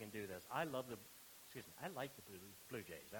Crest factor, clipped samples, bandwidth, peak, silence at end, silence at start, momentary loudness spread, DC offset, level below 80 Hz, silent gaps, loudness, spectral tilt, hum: 24 dB; under 0.1%; 19 kHz; -28 dBFS; 0 s; 0 s; 12 LU; under 0.1%; -80 dBFS; none; -50 LUFS; -4 dB/octave; none